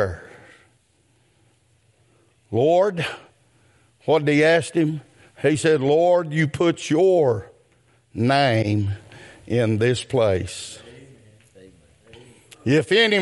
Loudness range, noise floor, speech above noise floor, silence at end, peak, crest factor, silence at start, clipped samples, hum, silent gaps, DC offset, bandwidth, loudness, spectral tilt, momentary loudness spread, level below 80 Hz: 6 LU; -62 dBFS; 43 dB; 0 s; -6 dBFS; 16 dB; 0 s; under 0.1%; none; none; under 0.1%; 11.5 kHz; -20 LUFS; -5.5 dB/octave; 15 LU; -60 dBFS